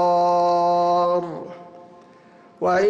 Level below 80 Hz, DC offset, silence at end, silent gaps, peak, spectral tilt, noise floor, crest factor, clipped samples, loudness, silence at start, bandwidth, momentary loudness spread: -66 dBFS; under 0.1%; 0 s; none; -12 dBFS; -6 dB/octave; -49 dBFS; 10 dB; under 0.1%; -20 LUFS; 0 s; 8 kHz; 18 LU